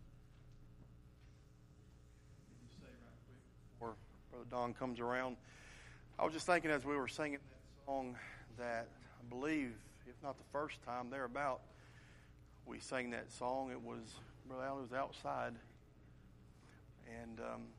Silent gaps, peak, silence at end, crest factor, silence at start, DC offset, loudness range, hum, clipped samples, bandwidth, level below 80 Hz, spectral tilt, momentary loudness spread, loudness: none; -20 dBFS; 0 s; 26 dB; 0 s; under 0.1%; 16 LU; none; under 0.1%; 13 kHz; -66 dBFS; -5 dB/octave; 23 LU; -44 LUFS